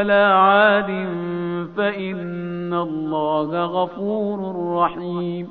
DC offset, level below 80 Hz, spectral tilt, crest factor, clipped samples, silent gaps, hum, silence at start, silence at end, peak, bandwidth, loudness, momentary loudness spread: 0.2%; -60 dBFS; -4 dB/octave; 18 dB; under 0.1%; none; none; 0 s; 0 s; -2 dBFS; 4.7 kHz; -20 LUFS; 13 LU